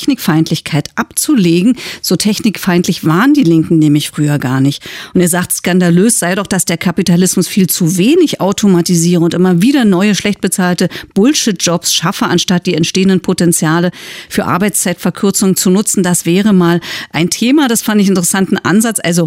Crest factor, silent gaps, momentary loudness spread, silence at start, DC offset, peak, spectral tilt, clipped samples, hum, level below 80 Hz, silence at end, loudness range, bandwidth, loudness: 10 dB; none; 5 LU; 0 s; under 0.1%; 0 dBFS; -4.5 dB/octave; under 0.1%; none; -48 dBFS; 0 s; 2 LU; 16 kHz; -11 LUFS